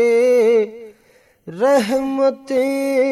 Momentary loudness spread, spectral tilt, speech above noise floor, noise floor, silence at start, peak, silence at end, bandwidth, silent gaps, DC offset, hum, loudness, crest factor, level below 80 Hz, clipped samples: 7 LU; -5 dB/octave; 37 dB; -54 dBFS; 0 s; -4 dBFS; 0 s; 13.5 kHz; none; under 0.1%; none; -17 LUFS; 12 dB; -62 dBFS; under 0.1%